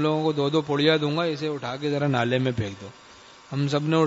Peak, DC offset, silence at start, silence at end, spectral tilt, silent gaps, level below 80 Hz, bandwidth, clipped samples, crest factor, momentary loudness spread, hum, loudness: -6 dBFS; under 0.1%; 0 s; 0 s; -6.5 dB/octave; none; -62 dBFS; 8 kHz; under 0.1%; 18 dB; 12 LU; none; -25 LUFS